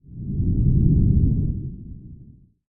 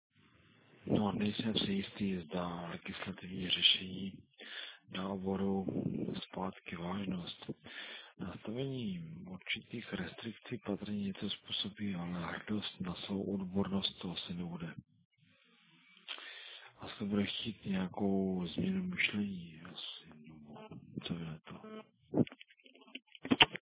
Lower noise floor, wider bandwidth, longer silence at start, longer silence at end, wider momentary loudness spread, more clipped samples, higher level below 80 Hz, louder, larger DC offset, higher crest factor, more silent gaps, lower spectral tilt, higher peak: second, -48 dBFS vs -69 dBFS; second, 0.9 kHz vs 4 kHz; second, 0.1 s vs 0.8 s; first, 0.45 s vs 0.1 s; first, 21 LU vs 16 LU; neither; first, -26 dBFS vs -64 dBFS; first, -21 LUFS vs -38 LUFS; neither; second, 16 dB vs 32 dB; second, none vs 15.05-15.11 s; first, -18.5 dB/octave vs -3.5 dB/octave; about the same, -4 dBFS vs -6 dBFS